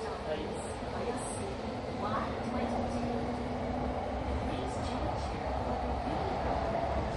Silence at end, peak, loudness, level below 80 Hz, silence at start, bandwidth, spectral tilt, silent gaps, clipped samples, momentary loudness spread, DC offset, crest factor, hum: 0 s; -20 dBFS; -35 LUFS; -42 dBFS; 0 s; 11.5 kHz; -6 dB/octave; none; under 0.1%; 4 LU; under 0.1%; 14 dB; none